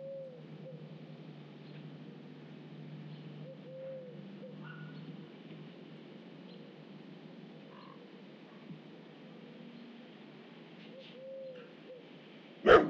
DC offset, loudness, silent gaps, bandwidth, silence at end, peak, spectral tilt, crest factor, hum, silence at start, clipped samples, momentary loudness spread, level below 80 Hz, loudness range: under 0.1%; -44 LUFS; none; 7.4 kHz; 0 s; -10 dBFS; -3.5 dB/octave; 30 dB; none; 0 s; under 0.1%; 6 LU; -64 dBFS; 4 LU